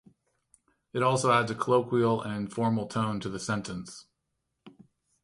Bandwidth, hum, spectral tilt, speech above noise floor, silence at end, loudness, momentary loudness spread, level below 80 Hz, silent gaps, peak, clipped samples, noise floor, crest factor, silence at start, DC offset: 11.5 kHz; none; -5.5 dB/octave; 53 dB; 0.55 s; -28 LUFS; 14 LU; -64 dBFS; none; -10 dBFS; under 0.1%; -81 dBFS; 20 dB; 0.95 s; under 0.1%